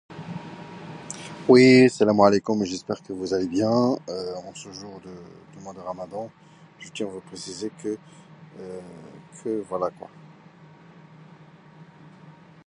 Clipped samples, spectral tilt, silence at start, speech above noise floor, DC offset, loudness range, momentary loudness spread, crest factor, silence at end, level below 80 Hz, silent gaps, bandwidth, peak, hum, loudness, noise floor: under 0.1%; -5.5 dB/octave; 0.1 s; 26 dB; under 0.1%; 17 LU; 25 LU; 22 dB; 2.65 s; -64 dBFS; none; 10.5 kHz; -2 dBFS; none; -22 LUFS; -50 dBFS